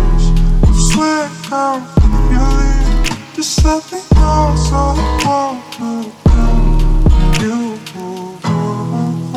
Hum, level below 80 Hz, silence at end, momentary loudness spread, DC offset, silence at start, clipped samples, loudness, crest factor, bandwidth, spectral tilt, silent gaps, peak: none; -14 dBFS; 0 s; 9 LU; under 0.1%; 0 s; under 0.1%; -15 LUFS; 12 dB; 12.5 kHz; -5.5 dB/octave; none; 0 dBFS